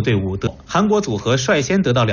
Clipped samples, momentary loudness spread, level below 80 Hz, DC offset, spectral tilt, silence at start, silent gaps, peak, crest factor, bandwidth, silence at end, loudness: under 0.1%; 5 LU; -40 dBFS; under 0.1%; -5.5 dB/octave; 0 s; none; -6 dBFS; 12 dB; 7.4 kHz; 0 s; -18 LUFS